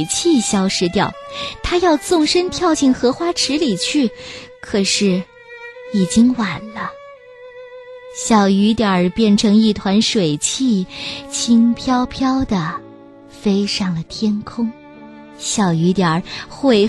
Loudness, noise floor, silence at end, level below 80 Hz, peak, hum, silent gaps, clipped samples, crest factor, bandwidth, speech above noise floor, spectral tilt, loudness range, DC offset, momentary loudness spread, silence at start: -17 LUFS; -40 dBFS; 0 s; -44 dBFS; 0 dBFS; none; none; under 0.1%; 16 dB; 12.5 kHz; 24 dB; -4.5 dB/octave; 5 LU; under 0.1%; 15 LU; 0 s